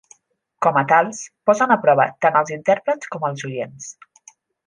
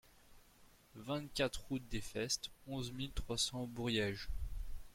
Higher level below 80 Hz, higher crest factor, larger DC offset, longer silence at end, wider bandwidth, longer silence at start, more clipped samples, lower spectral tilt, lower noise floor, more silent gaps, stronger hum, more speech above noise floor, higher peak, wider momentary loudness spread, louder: second, -70 dBFS vs -50 dBFS; about the same, 18 dB vs 20 dB; neither; first, 0.75 s vs 0 s; second, 10 kHz vs 16.5 kHz; first, 0.6 s vs 0.05 s; neither; first, -5 dB/octave vs -3.5 dB/octave; second, -54 dBFS vs -65 dBFS; neither; neither; first, 35 dB vs 25 dB; first, -2 dBFS vs -22 dBFS; about the same, 13 LU vs 11 LU; first, -19 LUFS vs -41 LUFS